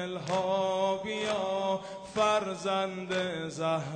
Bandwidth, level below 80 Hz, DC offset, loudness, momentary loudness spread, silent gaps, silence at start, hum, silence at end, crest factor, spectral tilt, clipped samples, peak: 9.8 kHz; -68 dBFS; under 0.1%; -31 LUFS; 6 LU; none; 0 s; none; 0 s; 16 dB; -4.5 dB/octave; under 0.1%; -14 dBFS